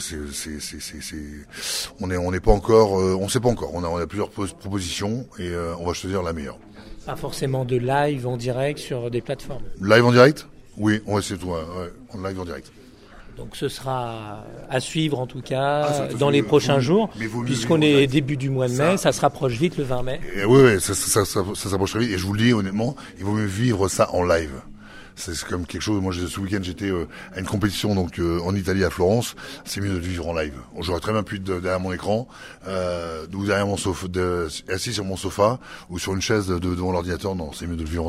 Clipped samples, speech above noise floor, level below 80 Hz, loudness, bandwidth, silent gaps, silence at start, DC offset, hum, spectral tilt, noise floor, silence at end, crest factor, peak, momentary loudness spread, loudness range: under 0.1%; 23 dB; -40 dBFS; -23 LUFS; 16 kHz; none; 0 s; under 0.1%; none; -5 dB/octave; -45 dBFS; 0 s; 22 dB; 0 dBFS; 14 LU; 8 LU